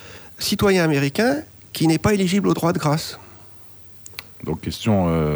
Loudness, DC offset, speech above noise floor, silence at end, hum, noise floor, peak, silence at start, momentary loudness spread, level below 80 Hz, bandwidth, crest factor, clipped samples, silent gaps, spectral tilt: -20 LUFS; under 0.1%; 24 dB; 0 s; none; -43 dBFS; -6 dBFS; 0 s; 21 LU; -44 dBFS; over 20 kHz; 16 dB; under 0.1%; none; -5.5 dB/octave